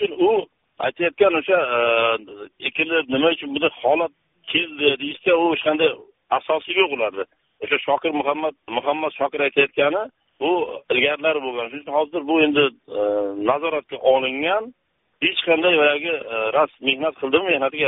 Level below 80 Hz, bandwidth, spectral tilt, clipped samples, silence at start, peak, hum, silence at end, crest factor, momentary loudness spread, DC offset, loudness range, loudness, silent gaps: -64 dBFS; 4 kHz; -1 dB/octave; under 0.1%; 0 s; -2 dBFS; none; 0 s; 18 dB; 8 LU; under 0.1%; 2 LU; -20 LUFS; none